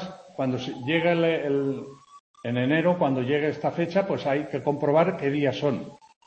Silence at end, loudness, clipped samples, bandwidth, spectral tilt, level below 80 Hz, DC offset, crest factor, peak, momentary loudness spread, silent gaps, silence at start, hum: 0.3 s; -25 LUFS; under 0.1%; 8.4 kHz; -7.5 dB/octave; -66 dBFS; under 0.1%; 18 dB; -6 dBFS; 10 LU; 2.20-2.34 s; 0 s; none